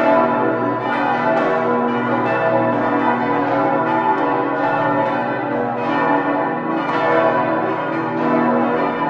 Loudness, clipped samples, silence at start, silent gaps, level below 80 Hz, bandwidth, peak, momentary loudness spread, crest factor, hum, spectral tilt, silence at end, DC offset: -18 LUFS; under 0.1%; 0 s; none; -56 dBFS; 7.2 kHz; -2 dBFS; 4 LU; 16 dB; 60 Hz at -40 dBFS; -8 dB/octave; 0 s; under 0.1%